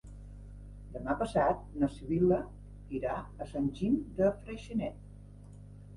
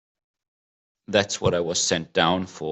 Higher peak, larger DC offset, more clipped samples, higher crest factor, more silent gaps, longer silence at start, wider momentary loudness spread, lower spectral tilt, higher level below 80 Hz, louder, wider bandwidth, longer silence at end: second, -16 dBFS vs -6 dBFS; neither; neither; about the same, 18 dB vs 20 dB; neither; second, 0.05 s vs 1.1 s; first, 22 LU vs 2 LU; first, -8 dB/octave vs -3 dB/octave; first, -50 dBFS vs -60 dBFS; second, -33 LUFS vs -23 LUFS; first, 11.5 kHz vs 8.4 kHz; about the same, 0 s vs 0 s